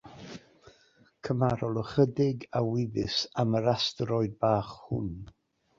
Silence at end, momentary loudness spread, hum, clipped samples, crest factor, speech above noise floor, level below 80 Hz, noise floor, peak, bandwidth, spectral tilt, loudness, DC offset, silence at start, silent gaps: 0.55 s; 18 LU; none; under 0.1%; 20 dB; 35 dB; -56 dBFS; -63 dBFS; -10 dBFS; 7.6 kHz; -6.5 dB/octave; -29 LUFS; under 0.1%; 0.05 s; none